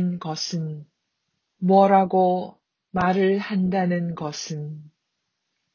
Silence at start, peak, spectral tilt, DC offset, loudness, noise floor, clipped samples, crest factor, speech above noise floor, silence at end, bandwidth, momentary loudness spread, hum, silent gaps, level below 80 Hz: 0 s; -4 dBFS; -6.5 dB/octave; under 0.1%; -22 LUFS; -78 dBFS; under 0.1%; 18 dB; 56 dB; 0.85 s; 7.2 kHz; 16 LU; none; none; -58 dBFS